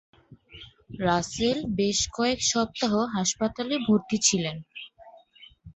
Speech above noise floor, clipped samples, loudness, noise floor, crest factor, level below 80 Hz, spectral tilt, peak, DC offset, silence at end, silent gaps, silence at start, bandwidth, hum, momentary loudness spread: 28 dB; under 0.1%; -25 LUFS; -54 dBFS; 20 dB; -52 dBFS; -3.5 dB/octave; -8 dBFS; under 0.1%; 0.05 s; none; 0.3 s; 8.4 kHz; none; 20 LU